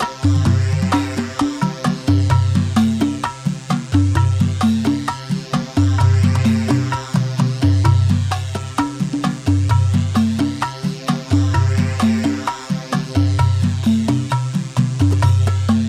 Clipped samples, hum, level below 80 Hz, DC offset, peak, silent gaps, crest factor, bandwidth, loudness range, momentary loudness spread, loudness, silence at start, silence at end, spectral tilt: under 0.1%; none; -40 dBFS; under 0.1%; -2 dBFS; none; 14 dB; 11 kHz; 2 LU; 7 LU; -18 LUFS; 0 s; 0 s; -6.5 dB/octave